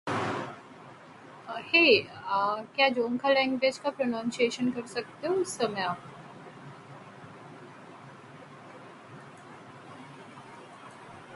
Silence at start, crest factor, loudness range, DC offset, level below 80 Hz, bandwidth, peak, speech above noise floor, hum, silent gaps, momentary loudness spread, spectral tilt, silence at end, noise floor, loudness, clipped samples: 0.05 s; 22 dB; 22 LU; under 0.1%; -72 dBFS; 11.5 kHz; -8 dBFS; 22 dB; none; none; 23 LU; -4 dB/octave; 0 s; -50 dBFS; -27 LUFS; under 0.1%